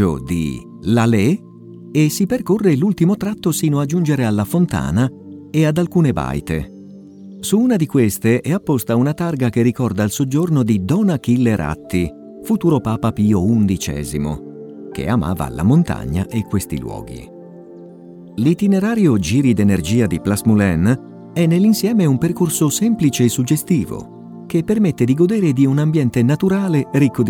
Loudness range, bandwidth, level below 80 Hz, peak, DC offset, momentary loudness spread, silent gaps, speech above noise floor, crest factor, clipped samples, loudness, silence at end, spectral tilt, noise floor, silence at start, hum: 4 LU; 18.5 kHz; -40 dBFS; -2 dBFS; under 0.1%; 10 LU; none; 22 dB; 14 dB; under 0.1%; -17 LUFS; 0 s; -6.5 dB/octave; -37 dBFS; 0 s; none